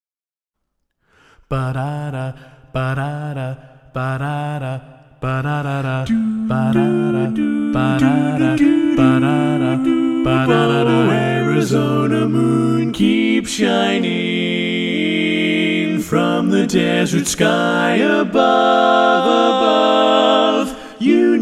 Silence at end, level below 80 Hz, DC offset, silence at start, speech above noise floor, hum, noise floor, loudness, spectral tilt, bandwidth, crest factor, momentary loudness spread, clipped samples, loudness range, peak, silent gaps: 0 s; -46 dBFS; under 0.1%; 1.5 s; over 75 dB; none; under -90 dBFS; -16 LUFS; -6 dB/octave; 14.5 kHz; 16 dB; 11 LU; under 0.1%; 10 LU; 0 dBFS; none